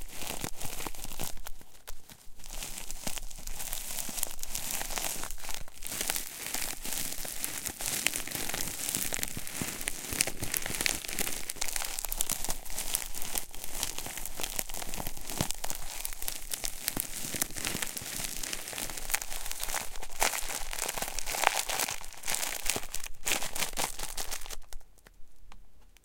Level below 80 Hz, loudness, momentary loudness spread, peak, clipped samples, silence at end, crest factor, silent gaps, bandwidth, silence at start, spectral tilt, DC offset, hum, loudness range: -44 dBFS; -34 LUFS; 10 LU; -2 dBFS; under 0.1%; 0.15 s; 32 dB; none; 17 kHz; 0 s; -1 dB/octave; under 0.1%; none; 5 LU